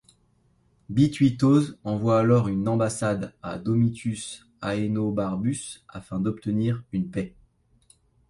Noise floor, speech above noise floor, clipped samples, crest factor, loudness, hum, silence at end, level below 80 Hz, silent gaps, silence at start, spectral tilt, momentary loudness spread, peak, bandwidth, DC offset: -64 dBFS; 40 dB; under 0.1%; 18 dB; -25 LUFS; none; 1 s; -54 dBFS; none; 0.9 s; -7 dB/octave; 14 LU; -8 dBFS; 11.5 kHz; under 0.1%